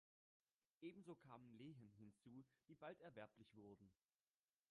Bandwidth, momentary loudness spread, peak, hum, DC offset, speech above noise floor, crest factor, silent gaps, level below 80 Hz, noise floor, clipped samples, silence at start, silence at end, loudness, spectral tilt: 10 kHz; 7 LU; -46 dBFS; none; under 0.1%; over 27 dB; 20 dB; none; under -90 dBFS; under -90 dBFS; under 0.1%; 0.8 s; 0.8 s; -63 LUFS; -7 dB/octave